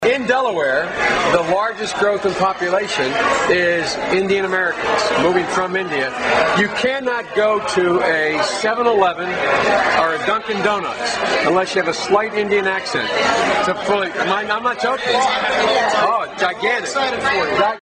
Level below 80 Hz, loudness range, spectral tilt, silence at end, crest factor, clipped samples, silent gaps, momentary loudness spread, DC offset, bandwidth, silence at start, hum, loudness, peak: -50 dBFS; 1 LU; -3.5 dB/octave; 0.1 s; 16 dB; under 0.1%; none; 4 LU; under 0.1%; 10 kHz; 0 s; none; -17 LUFS; 0 dBFS